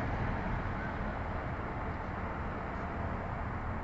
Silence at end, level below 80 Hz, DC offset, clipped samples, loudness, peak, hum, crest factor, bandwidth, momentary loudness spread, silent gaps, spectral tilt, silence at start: 0 s; -42 dBFS; 0.1%; under 0.1%; -38 LUFS; -22 dBFS; none; 14 dB; 7.6 kHz; 3 LU; none; -6.5 dB/octave; 0 s